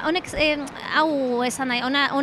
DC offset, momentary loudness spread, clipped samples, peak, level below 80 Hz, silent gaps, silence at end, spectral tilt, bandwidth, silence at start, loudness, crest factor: under 0.1%; 3 LU; under 0.1%; -8 dBFS; -48 dBFS; none; 0 s; -3 dB/octave; 15 kHz; 0 s; -22 LUFS; 16 dB